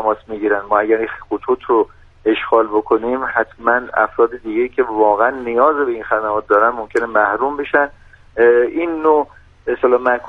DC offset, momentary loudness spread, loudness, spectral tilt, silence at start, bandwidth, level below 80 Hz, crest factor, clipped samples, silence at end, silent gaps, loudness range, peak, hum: under 0.1%; 7 LU; -16 LUFS; -6.5 dB/octave; 0 s; 5.2 kHz; -48 dBFS; 16 dB; under 0.1%; 0 s; none; 2 LU; 0 dBFS; none